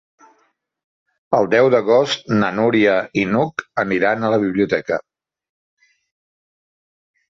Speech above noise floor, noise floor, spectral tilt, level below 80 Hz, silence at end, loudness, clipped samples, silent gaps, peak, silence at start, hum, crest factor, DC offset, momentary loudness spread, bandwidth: 47 dB; -64 dBFS; -6 dB/octave; -58 dBFS; 2.3 s; -17 LUFS; under 0.1%; none; -2 dBFS; 1.3 s; none; 18 dB; under 0.1%; 7 LU; 7.6 kHz